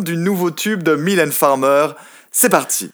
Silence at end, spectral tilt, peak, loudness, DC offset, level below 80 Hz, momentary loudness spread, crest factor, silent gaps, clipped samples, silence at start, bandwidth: 0.05 s; -4 dB/octave; 0 dBFS; -15 LUFS; under 0.1%; -68 dBFS; 5 LU; 16 dB; none; under 0.1%; 0 s; over 20 kHz